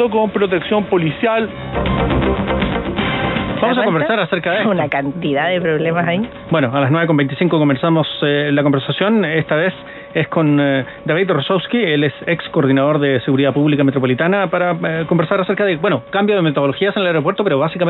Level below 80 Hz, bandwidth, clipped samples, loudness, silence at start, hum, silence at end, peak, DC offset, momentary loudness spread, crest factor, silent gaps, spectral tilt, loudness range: -36 dBFS; 4.2 kHz; under 0.1%; -16 LUFS; 0 s; none; 0 s; -2 dBFS; under 0.1%; 5 LU; 14 dB; none; -9 dB/octave; 2 LU